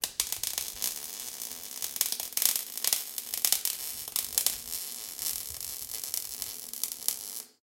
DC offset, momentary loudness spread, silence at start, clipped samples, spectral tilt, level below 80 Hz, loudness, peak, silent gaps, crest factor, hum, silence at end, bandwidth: under 0.1%; 10 LU; 0 s; under 0.1%; 2 dB/octave; -66 dBFS; -31 LUFS; 0 dBFS; none; 34 dB; none; 0.15 s; 17.5 kHz